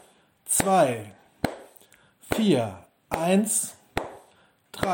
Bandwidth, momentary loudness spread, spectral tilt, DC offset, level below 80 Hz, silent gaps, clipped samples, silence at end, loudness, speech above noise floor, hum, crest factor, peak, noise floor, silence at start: 17 kHz; 21 LU; -4 dB/octave; under 0.1%; -54 dBFS; none; under 0.1%; 0 s; -25 LUFS; 37 dB; none; 22 dB; -4 dBFS; -60 dBFS; 0.45 s